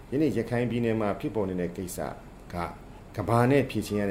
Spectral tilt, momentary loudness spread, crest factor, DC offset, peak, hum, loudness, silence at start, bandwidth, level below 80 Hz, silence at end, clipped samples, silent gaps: -7 dB/octave; 14 LU; 18 dB; under 0.1%; -10 dBFS; none; -28 LUFS; 0 s; 16.5 kHz; -50 dBFS; 0 s; under 0.1%; none